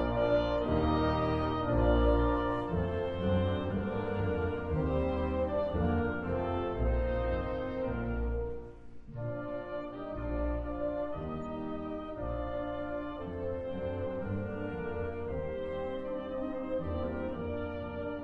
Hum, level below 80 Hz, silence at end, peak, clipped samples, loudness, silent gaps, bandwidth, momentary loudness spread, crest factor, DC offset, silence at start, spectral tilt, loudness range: none; -40 dBFS; 0 s; -16 dBFS; under 0.1%; -34 LUFS; none; 5.6 kHz; 10 LU; 16 dB; under 0.1%; 0 s; -9.5 dB/octave; 7 LU